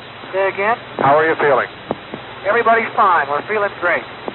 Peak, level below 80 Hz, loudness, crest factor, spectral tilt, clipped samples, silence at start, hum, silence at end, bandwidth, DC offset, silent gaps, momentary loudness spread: -4 dBFS; -56 dBFS; -16 LUFS; 14 dB; -2.5 dB/octave; under 0.1%; 0 s; none; 0 s; 4.2 kHz; under 0.1%; none; 11 LU